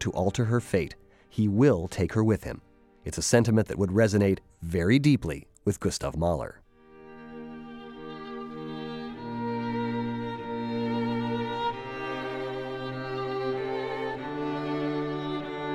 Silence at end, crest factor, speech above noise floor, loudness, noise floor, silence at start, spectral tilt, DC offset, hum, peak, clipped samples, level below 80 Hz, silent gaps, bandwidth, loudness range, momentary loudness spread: 0 s; 22 dB; 27 dB; -28 LUFS; -52 dBFS; 0 s; -6 dB/octave; under 0.1%; none; -8 dBFS; under 0.1%; -50 dBFS; none; 15.5 kHz; 10 LU; 17 LU